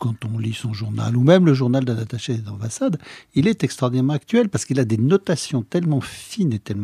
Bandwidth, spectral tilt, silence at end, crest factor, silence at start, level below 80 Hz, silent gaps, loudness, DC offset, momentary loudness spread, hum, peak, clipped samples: 14 kHz; -6.5 dB/octave; 0 s; 18 dB; 0 s; -58 dBFS; none; -20 LUFS; under 0.1%; 11 LU; none; -2 dBFS; under 0.1%